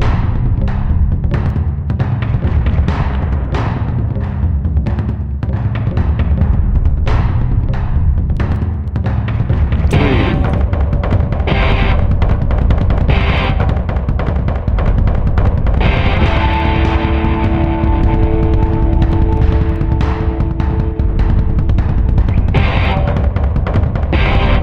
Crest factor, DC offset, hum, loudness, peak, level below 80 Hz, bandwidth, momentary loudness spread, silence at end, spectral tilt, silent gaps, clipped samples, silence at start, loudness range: 12 dB; under 0.1%; none; -15 LUFS; 0 dBFS; -16 dBFS; 5.8 kHz; 4 LU; 0 s; -8.5 dB/octave; none; under 0.1%; 0 s; 2 LU